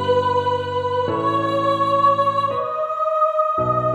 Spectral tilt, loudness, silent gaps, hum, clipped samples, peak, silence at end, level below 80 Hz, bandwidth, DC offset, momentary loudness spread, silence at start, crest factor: -7 dB/octave; -19 LUFS; none; none; under 0.1%; -6 dBFS; 0 s; -54 dBFS; 10.5 kHz; under 0.1%; 6 LU; 0 s; 12 dB